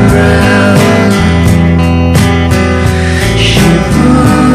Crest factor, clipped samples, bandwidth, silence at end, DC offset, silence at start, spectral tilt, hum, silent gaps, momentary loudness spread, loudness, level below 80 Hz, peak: 6 dB; 2%; 14.5 kHz; 0 s; under 0.1%; 0 s; -6 dB/octave; none; none; 3 LU; -7 LUFS; -18 dBFS; 0 dBFS